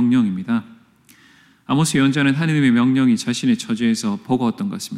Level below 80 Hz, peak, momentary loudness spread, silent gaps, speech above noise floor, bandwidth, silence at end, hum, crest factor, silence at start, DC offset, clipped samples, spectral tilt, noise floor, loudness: -62 dBFS; -6 dBFS; 7 LU; none; 34 dB; 14 kHz; 0 s; none; 12 dB; 0 s; under 0.1%; under 0.1%; -5.5 dB/octave; -52 dBFS; -18 LUFS